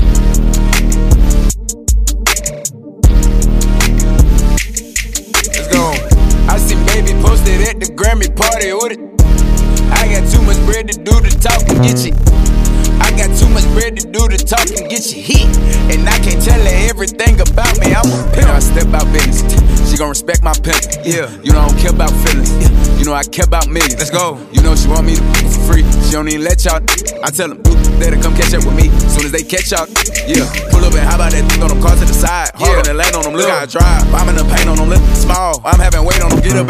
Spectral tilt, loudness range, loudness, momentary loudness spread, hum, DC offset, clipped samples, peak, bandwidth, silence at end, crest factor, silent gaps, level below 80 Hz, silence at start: -4.5 dB/octave; 1 LU; -12 LUFS; 4 LU; none; under 0.1%; 0.6%; 0 dBFS; 15.5 kHz; 0 s; 8 dB; none; -10 dBFS; 0 s